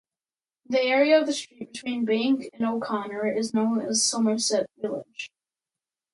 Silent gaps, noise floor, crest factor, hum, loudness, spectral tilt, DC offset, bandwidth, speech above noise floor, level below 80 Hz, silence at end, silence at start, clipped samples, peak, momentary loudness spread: none; under -90 dBFS; 18 dB; none; -25 LUFS; -3 dB/octave; under 0.1%; 11.5 kHz; over 65 dB; -74 dBFS; 0.85 s; 0.7 s; under 0.1%; -8 dBFS; 14 LU